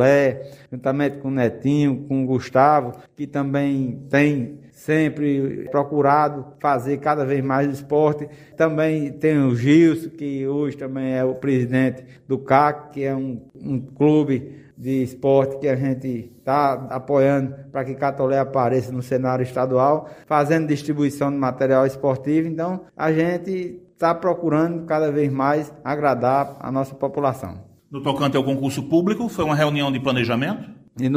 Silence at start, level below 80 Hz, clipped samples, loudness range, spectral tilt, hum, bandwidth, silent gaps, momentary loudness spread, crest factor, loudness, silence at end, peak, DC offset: 0 s; -58 dBFS; under 0.1%; 2 LU; -7.5 dB/octave; none; 15.5 kHz; none; 10 LU; 20 dB; -21 LUFS; 0 s; 0 dBFS; under 0.1%